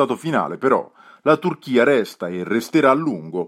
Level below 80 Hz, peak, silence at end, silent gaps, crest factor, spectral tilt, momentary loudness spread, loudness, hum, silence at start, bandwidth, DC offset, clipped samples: -70 dBFS; -2 dBFS; 0 s; none; 18 dB; -6 dB/octave; 8 LU; -19 LUFS; none; 0 s; 15.5 kHz; under 0.1%; under 0.1%